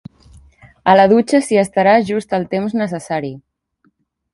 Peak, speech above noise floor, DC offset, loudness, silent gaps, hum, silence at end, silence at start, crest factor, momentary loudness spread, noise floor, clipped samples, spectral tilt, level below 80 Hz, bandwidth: 0 dBFS; 47 dB; under 0.1%; -15 LUFS; none; none; 0.95 s; 0.85 s; 16 dB; 12 LU; -62 dBFS; under 0.1%; -6 dB/octave; -52 dBFS; 11.5 kHz